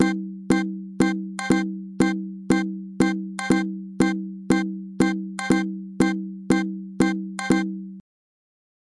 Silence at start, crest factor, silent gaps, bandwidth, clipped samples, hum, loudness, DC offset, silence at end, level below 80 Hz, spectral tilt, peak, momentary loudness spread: 0 s; 18 dB; none; 11.5 kHz; under 0.1%; none; -24 LUFS; under 0.1%; 1 s; -54 dBFS; -6 dB/octave; -6 dBFS; 8 LU